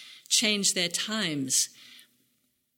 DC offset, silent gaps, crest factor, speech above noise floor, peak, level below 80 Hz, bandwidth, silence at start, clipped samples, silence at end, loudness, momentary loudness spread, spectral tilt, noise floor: under 0.1%; none; 20 dB; 46 dB; -10 dBFS; -78 dBFS; 17.5 kHz; 0 s; under 0.1%; 0.8 s; -25 LUFS; 6 LU; -1 dB/octave; -73 dBFS